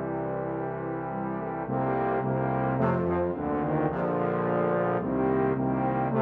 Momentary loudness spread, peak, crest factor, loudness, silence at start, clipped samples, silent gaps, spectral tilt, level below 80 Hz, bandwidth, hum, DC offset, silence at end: 6 LU; -12 dBFS; 16 dB; -28 LUFS; 0 s; under 0.1%; none; -11.5 dB/octave; -52 dBFS; 4.4 kHz; none; under 0.1%; 0 s